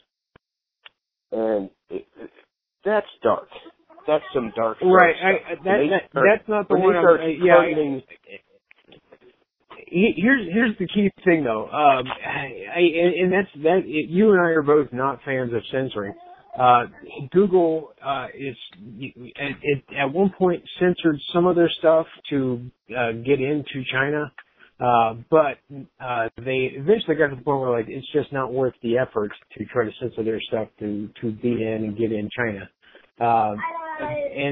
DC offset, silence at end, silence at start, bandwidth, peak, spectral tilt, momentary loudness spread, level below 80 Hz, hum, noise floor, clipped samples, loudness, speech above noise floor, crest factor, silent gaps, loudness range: under 0.1%; 0 s; 1.3 s; 4.1 kHz; 0 dBFS; -10 dB/octave; 13 LU; -58 dBFS; none; -62 dBFS; under 0.1%; -21 LUFS; 40 dB; 22 dB; none; 7 LU